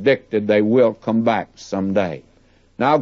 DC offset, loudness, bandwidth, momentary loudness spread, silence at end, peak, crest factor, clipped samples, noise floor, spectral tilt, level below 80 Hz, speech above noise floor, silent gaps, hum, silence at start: under 0.1%; -19 LUFS; 7.4 kHz; 10 LU; 0 s; -4 dBFS; 16 dB; under 0.1%; -54 dBFS; -7 dB/octave; -58 dBFS; 36 dB; none; none; 0 s